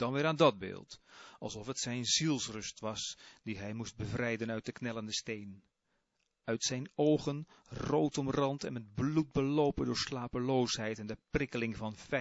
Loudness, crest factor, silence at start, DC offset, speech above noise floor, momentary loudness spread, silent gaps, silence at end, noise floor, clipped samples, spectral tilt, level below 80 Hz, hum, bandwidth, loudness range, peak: -35 LUFS; 22 dB; 0 s; under 0.1%; 46 dB; 14 LU; none; 0 s; -81 dBFS; under 0.1%; -4.5 dB/octave; -60 dBFS; none; 8 kHz; 6 LU; -12 dBFS